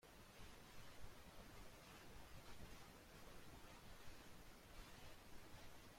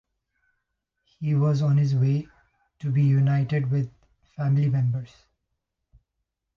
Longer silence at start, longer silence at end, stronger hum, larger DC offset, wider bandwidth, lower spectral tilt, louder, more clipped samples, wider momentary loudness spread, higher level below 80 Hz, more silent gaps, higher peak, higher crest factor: second, 0 s vs 1.2 s; second, 0 s vs 1.5 s; neither; neither; first, 16.5 kHz vs 6.4 kHz; second, -3.5 dB/octave vs -9.5 dB/octave; second, -62 LUFS vs -24 LUFS; neither; second, 2 LU vs 12 LU; second, -66 dBFS vs -60 dBFS; neither; second, -42 dBFS vs -12 dBFS; about the same, 16 dB vs 12 dB